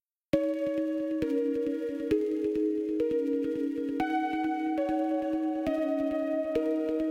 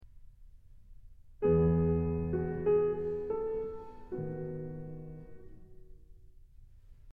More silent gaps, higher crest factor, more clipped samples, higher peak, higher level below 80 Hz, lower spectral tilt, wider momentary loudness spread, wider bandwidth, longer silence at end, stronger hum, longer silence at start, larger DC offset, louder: neither; about the same, 18 dB vs 18 dB; neither; first, -12 dBFS vs -16 dBFS; second, -60 dBFS vs -50 dBFS; second, -7 dB/octave vs -12 dB/octave; second, 2 LU vs 19 LU; first, 8 kHz vs 3.1 kHz; about the same, 0 s vs 0 s; neither; first, 0.35 s vs 0.05 s; neither; first, -30 LUFS vs -33 LUFS